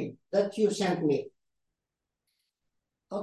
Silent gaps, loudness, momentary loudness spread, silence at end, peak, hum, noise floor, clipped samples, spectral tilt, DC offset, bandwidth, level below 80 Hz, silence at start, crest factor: none; -29 LUFS; 10 LU; 0 s; -14 dBFS; none; -88 dBFS; under 0.1%; -5.5 dB/octave; under 0.1%; 12 kHz; -76 dBFS; 0 s; 18 dB